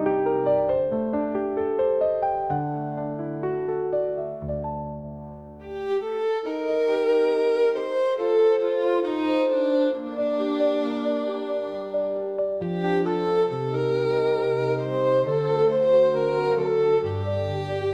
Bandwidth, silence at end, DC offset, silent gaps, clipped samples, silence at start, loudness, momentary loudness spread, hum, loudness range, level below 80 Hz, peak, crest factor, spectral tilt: 8.4 kHz; 0 s; under 0.1%; none; under 0.1%; 0 s; -24 LUFS; 9 LU; none; 6 LU; -56 dBFS; -10 dBFS; 12 dB; -8 dB/octave